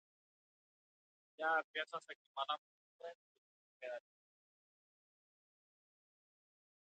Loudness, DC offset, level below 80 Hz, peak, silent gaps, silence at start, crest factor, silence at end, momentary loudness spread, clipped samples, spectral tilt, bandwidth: -43 LUFS; under 0.1%; under -90 dBFS; -26 dBFS; 1.64-1.74 s, 2.15-2.35 s, 2.58-2.99 s, 3.15-3.80 s; 1.4 s; 24 dB; 2.95 s; 17 LU; under 0.1%; -1.5 dB/octave; 8.4 kHz